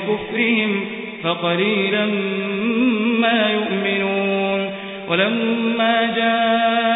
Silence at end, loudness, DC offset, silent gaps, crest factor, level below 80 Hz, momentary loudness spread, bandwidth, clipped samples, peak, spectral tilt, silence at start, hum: 0 s; -19 LUFS; under 0.1%; none; 16 dB; -66 dBFS; 6 LU; 4 kHz; under 0.1%; -4 dBFS; -10.5 dB/octave; 0 s; none